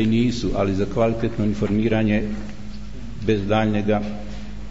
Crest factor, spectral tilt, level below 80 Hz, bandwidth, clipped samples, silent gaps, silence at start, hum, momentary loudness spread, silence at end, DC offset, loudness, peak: 14 dB; -7.5 dB/octave; -36 dBFS; 8 kHz; under 0.1%; none; 0 s; none; 16 LU; 0 s; 3%; -22 LUFS; -8 dBFS